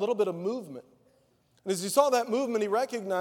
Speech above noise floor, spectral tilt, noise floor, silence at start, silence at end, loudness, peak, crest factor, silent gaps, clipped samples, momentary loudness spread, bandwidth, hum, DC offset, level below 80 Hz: 39 dB; -4 dB/octave; -67 dBFS; 0 s; 0 s; -28 LUFS; -8 dBFS; 20 dB; none; under 0.1%; 16 LU; 18.5 kHz; none; under 0.1%; -84 dBFS